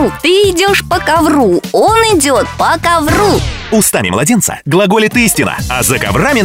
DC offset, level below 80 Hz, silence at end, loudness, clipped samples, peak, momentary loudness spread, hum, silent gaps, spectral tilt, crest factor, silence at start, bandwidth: 0.2%; -28 dBFS; 0 s; -10 LUFS; under 0.1%; 0 dBFS; 3 LU; none; none; -4 dB/octave; 10 dB; 0 s; 16.5 kHz